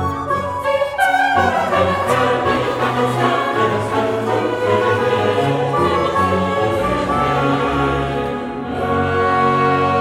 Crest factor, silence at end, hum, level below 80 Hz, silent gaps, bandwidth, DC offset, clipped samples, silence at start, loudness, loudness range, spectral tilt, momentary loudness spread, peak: 14 dB; 0 s; none; -40 dBFS; none; 16 kHz; under 0.1%; under 0.1%; 0 s; -17 LUFS; 1 LU; -6 dB/octave; 5 LU; -4 dBFS